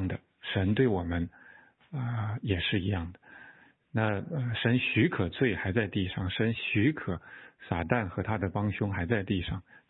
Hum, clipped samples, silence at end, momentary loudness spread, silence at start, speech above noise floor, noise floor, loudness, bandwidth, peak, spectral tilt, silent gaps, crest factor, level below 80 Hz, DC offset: none; under 0.1%; 0.1 s; 12 LU; 0 s; 27 dB; -57 dBFS; -30 LUFS; 4.1 kHz; -10 dBFS; -10.5 dB/octave; none; 20 dB; -52 dBFS; under 0.1%